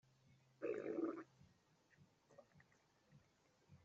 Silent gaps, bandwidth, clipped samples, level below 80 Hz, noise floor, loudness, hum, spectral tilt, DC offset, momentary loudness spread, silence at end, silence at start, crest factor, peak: none; 7.6 kHz; under 0.1%; under -90 dBFS; -77 dBFS; -48 LUFS; none; -6.5 dB/octave; under 0.1%; 23 LU; 0.1 s; 0.6 s; 20 dB; -34 dBFS